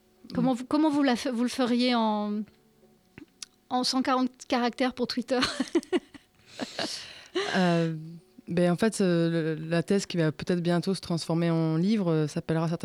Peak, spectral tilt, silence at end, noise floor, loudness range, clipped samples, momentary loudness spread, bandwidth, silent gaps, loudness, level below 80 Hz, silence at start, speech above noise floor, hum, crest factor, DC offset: -12 dBFS; -5.5 dB/octave; 0.05 s; -61 dBFS; 3 LU; under 0.1%; 11 LU; 13 kHz; none; -27 LUFS; -64 dBFS; 0.25 s; 35 dB; none; 16 dB; under 0.1%